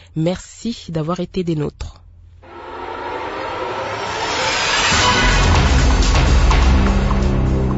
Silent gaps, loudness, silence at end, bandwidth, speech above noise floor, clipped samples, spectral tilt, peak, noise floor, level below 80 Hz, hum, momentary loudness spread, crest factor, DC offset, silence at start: none; -17 LUFS; 0 s; 8 kHz; 21 dB; under 0.1%; -4.5 dB/octave; -4 dBFS; -42 dBFS; -20 dBFS; none; 14 LU; 14 dB; under 0.1%; 0.15 s